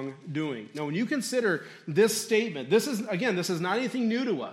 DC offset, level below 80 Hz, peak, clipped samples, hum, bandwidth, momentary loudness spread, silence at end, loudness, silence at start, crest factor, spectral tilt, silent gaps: under 0.1%; -80 dBFS; -10 dBFS; under 0.1%; none; 16 kHz; 8 LU; 0 s; -28 LUFS; 0 s; 18 dB; -4.5 dB/octave; none